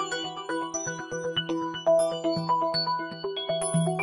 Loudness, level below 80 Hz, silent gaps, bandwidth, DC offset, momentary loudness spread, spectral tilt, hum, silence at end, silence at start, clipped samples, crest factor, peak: -28 LUFS; -68 dBFS; none; 11.5 kHz; under 0.1%; 8 LU; -4 dB/octave; none; 0 s; 0 s; under 0.1%; 16 dB; -12 dBFS